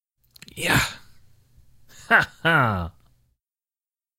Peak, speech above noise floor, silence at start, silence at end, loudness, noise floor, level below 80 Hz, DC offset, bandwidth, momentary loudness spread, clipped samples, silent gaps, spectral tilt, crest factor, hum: -2 dBFS; over 69 dB; 0.55 s; 1.3 s; -21 LUFS; under -90 dBFS; -48 dBFS; under 0.1%; 16 kHz; 19 LU; under 0.1%; none; -4 dB/octave; 24 dB; none